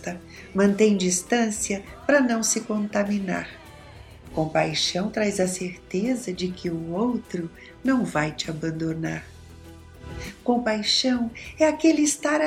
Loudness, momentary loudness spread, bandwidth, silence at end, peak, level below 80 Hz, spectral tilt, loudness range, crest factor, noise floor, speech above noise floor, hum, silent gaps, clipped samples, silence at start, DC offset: -24 LUFS; 13 LU; 15 kHz; 0 s; -6 dBFS; -50 dBFS; -4 dB/octave; 5 LU; 18 dB; -45 dBFS; 21 dB; none; none; under 0.1%; 0 s; under 0.1%